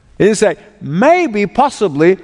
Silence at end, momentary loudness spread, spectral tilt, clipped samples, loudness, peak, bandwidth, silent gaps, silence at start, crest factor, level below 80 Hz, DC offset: 0.05 s; 6 LU; -5.5 dB/octave; 0.1%; -13 LUFS; 0 dBFS; 11 kHz; none; 0.2 s; 12 dB; -48 dBFS; under 0.1%